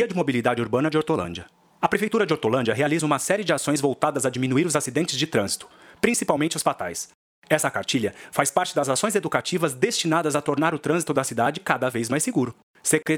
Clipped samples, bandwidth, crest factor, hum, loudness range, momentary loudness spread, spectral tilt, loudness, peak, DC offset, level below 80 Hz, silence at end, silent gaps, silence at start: under 0.1%; 19 kHz; 22 dB; none; 2 LU; 5 LU; -4 dB/octave; -23 LUFS; -2 dBFS; under 0.1%; -62 dBFS; 0 s; 7.15-7.42 s, 12.63-12.74 s; 0 s